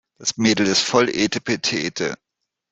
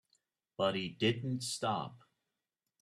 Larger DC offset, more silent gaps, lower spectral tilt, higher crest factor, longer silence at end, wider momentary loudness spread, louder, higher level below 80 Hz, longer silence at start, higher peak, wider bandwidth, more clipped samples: neither; neither; second, -3 dB/octave vs -4.5 dB/octave; about the same, 20 dB vs 20 dB; second, 0.55 s vs 0.85 s; about the same, 10 LU vs 10 LU; first, -20 LUFS vs -35 LUFS; first, -58 dBFS vs -74 dBFS; second, 0.2 s vs 0.6 s; first, -2 dBFS vs -18 dBFS; second, 8.4 kHz vs 14 kHz; neither